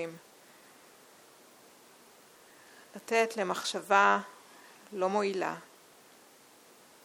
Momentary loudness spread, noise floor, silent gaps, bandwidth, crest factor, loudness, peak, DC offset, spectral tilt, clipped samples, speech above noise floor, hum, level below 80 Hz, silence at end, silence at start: 28 LU; -58 dBFS; none; 19 kHz; 24 dB; -29 LUFS; -10 dBFS; under 0.1%; -3.5 dB/octave; under 0.1%; 29 dB; none; -86 dBFS; 1.4 s; 0 s